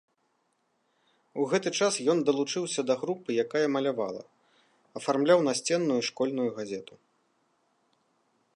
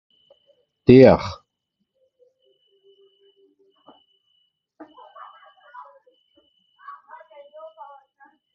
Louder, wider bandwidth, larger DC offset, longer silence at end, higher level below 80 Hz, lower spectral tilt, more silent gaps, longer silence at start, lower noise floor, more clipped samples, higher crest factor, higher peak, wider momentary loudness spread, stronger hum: second, -28 LUFS vs -14 LUFS; first, 11.5 kHz vs 6.2 kHz; neither; second, 1.7 s vs 7.25 s; second, -82 dBFS vs -48 dBFS; second, -4 dB/octave vs -7 dB/octave; neither; first, 1.35 s vs 0.9 s; about the same, -74 dBFS vs -77 dBFS; neither; about the same, 20 dB vs 24 dB; second, -10 dBFS vs 0 dBFS; second, 13 LU vs 32 LU; neither